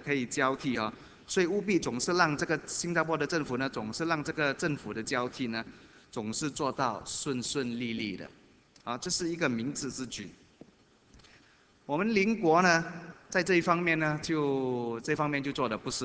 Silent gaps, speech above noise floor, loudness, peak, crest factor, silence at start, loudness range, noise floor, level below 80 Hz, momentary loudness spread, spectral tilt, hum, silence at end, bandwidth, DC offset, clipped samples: none; 32 dB; -30 LUFS; -8 dBFS; 24 dB; 0 s; 7 LU; -62 dBFS; -64 dBFS; 12 LU; -4 dB/octave; none; 0 s; 8 kHz; under 0.1%; under 0.1%